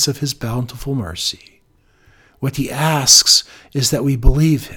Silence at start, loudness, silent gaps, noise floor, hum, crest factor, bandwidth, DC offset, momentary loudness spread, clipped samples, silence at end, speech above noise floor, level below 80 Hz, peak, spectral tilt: 0 s; -15 LUFS; none; -55 dBFS; none; 16 dB; 19 kHz; under 0.1%; 16 LU; 0.1%; 0 s; 39 dB; -24 dBFS; 0 dBFS; -3 dB/octave